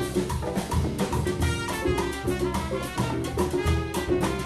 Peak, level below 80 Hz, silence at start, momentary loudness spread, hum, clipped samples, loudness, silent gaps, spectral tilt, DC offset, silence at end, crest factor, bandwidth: -12 dBFS; -36 dBFS; 0 s; 3 LU; none; under 0.1%; -27 LUFS; none; -5.5 dB/octave; 0.1%; 0 s; 14 dB; 15.5 kHz